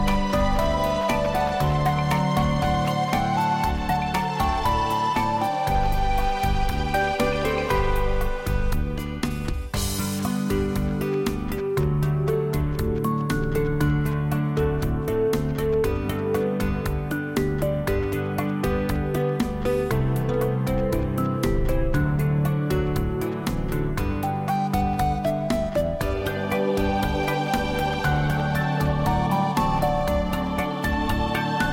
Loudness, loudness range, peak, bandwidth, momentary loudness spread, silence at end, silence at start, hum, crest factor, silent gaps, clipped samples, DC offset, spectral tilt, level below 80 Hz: -24 LUFS; 2 LU; -12 dBFS; 17 kHz; 4 LU; 0 s; 0 s; none; 12 dB; none; under 0.1%; under 0.1%; -6.5 dB/octave; -30 dBFS